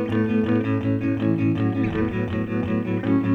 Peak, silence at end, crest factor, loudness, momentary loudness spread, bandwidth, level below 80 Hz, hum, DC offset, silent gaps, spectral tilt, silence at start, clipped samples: -8 dBFS; 0 s; 12 dB; -23 LUFS; 3 LU; 5.8 kHz; -46 dBFS; none; under 0.1%; none; -9.5 dB/octave; 0 s; under 0.1%